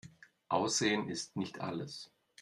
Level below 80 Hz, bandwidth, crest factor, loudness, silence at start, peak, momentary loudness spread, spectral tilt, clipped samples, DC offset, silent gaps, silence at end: -76 dBFS; 12.5 kHz; 20 dB; -35 LUFS; 0.05 s; -18 dBFS; 15 LU; -3.5 dB/octave; under 0.1%; under 0.1%; none; 0.35 s